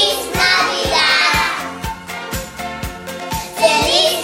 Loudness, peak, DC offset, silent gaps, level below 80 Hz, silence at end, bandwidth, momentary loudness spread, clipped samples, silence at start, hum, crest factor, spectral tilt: -15 LUFS; 0 dBFS; under 0.1%; none; -36 dBFS; 0 s; 16.5 kHz; 15 LU; under 0.1%; 0 s; none; 18 dB; -2 dB/octave